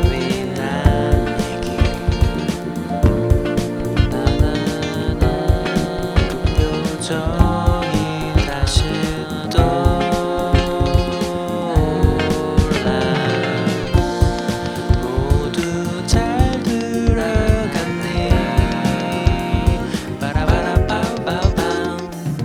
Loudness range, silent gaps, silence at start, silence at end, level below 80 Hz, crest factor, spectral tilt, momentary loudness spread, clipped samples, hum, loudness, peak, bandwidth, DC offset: 1 LU; none; 0 s; 0 s; -22 dBFS; 18 dB; -6 dB/octave; 5 LU; under 0.1%; none; -19 LUFS; 0 dBFS; 15.5 kHz; 0.2%